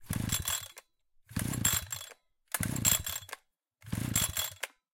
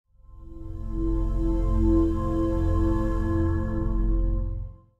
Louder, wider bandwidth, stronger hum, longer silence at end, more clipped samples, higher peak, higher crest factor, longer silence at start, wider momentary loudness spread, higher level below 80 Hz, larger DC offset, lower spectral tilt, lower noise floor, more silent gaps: second, -32 LUFS vs -27 LUFS; first, 17 kHz vs 3.3 kHz; neither; about the same, 0.3 s vs 0.25 s; neither; about the same, -12 dBFS vs -10 dBFS; first, 24 dB vs 14 dB; second, 0 s vs 0.3 s; about the same, 16 LU vs 14 LU; second, -52 dBFS vs -28 dBFS; neither; second, -2.5 dB/octave vs -10 dB/octave; first, -67 dBFS vs -44 dBFS; neither